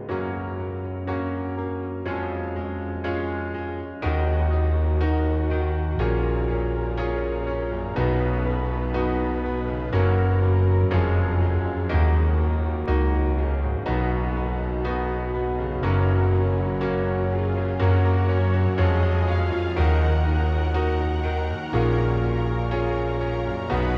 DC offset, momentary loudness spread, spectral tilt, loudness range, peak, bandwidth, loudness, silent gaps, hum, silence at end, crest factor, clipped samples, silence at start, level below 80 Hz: under 0.1%; 8 LU; -9.5 dB/octave; 4 LU; -8 dBFS; 5.4 kHz; -24 LUFS; none; none; 0 s; 14 dB; under 0.1%; 0 s; -28 dBFS